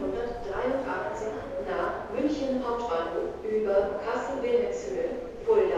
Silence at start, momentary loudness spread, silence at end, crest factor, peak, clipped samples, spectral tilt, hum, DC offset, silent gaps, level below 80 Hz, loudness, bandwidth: 0 s; 7 LU; 0 s; 16 dB; -14 dBFS; under 0.1%; -5.5 dB/octave; none; under 0.1%; none; -50 dBFS; -30 LUFS; 9.2 kHz